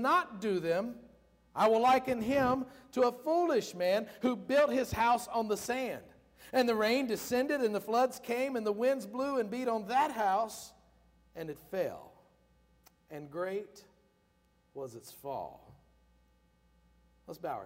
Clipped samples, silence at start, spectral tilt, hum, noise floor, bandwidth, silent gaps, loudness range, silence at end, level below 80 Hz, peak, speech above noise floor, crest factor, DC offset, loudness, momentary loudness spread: under 0.1%; 0 s; -4.5 dB/octave; none; -71 dBFS; 16 kHz; none; 15 LU; 0 s; -66 dBFS; -18 dBFS; 39 dB; 16 dB; under 0.1%; -32 LUFS; 17 LU